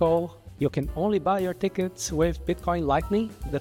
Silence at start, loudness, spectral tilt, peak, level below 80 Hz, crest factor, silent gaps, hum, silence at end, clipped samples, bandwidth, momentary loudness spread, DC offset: 0 s; -27 LUFS; -6 dB/octave; -12 dBFS; -40 dBFS; 14 dB; none; none; 0 s; under 0.1%; 17 kHz; 5 LU; under 0.1%